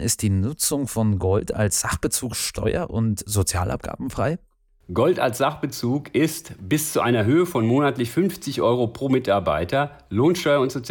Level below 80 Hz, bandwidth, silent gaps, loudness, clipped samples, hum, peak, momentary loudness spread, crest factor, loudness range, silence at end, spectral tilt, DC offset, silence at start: -46 dBFS; 19.5 kHz; none; -22 LUFS; under 0.1%; none; -8 dBFS; 6 LU; 14 dB; 3 LU; 0 s; -5 dB/octave; under 0.1%; 0 s